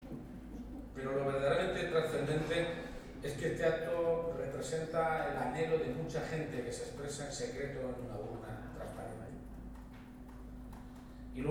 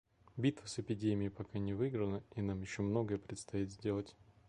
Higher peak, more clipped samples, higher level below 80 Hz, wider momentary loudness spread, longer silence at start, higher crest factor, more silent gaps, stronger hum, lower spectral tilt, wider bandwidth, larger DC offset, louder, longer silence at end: about the same, -20 dBFS vs -20 dBFS; neither; first, -54 dBFS vs -60 dBFS; first, 17 LU vs 6 LU; second, 0 s vs 0.35 s; about the same, 18 dB vs 18 dB; neither; neither; about the same, -5.5 dB/octave vs -6.5 dB/octave; first, 16.5 kHz vs 11 kHz; neither; about the same, -38 LUFS vs -39 LUFS; second, 0 s vs 0.35 s